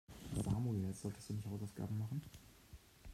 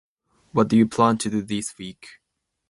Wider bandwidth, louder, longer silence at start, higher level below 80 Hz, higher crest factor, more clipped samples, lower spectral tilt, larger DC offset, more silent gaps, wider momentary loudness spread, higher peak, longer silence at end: first, 15 kHz vs 11.5 kHz; second, -43 LUFS vs -22 LUFS; second, 0.1 s vs 0.55 s; about the same, -60 dBFS vs -60 dBFS; about the same, 18 dB vs 20 dB; neither; first, -7 dB/octave vs -5.5 dB/octave; neither; neither; first, 21 LU vs 16 LU; second, -26 dBFS vs -4 dBFS; second, 0 s vs 0.6 s